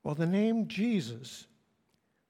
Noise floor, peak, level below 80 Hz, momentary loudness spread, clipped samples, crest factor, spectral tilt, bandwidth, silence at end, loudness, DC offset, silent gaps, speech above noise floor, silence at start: -75 dBFS; -18 dBFS; -74 dBFS; 17 LU; under 0.1%; 14 dB; -6.5 dB/octave; 13 kHz; 0.85 s; -31 LUFS; under 0.1%; none; 44 dB; 0.05 s